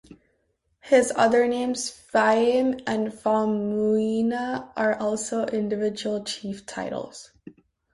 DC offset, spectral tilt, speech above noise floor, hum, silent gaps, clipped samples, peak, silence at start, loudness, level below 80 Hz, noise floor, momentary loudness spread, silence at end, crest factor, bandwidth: under 0.1%; -4.5 dB/octave; 48 dB; none; none; under 0.1%; -6 dBFS; 0.1 s; -24 LUFS; -62 dBFS; -71 dBFS; 12 LU; 0.45 s; 18 dB; 11.5 kHz